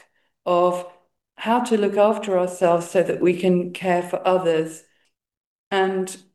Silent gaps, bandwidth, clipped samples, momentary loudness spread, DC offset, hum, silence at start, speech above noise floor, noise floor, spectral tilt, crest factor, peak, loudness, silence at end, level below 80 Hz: 5.37-5.71 s; 12.5 kHz; under 0.1%; 9 LU; under 0.1%; none; 0.45 s; 48 dB; -68 dBFS; -6 dB/octave; 16 dB; -4 dBFS; -21 LUFS; 0.15 s; -72 dBFS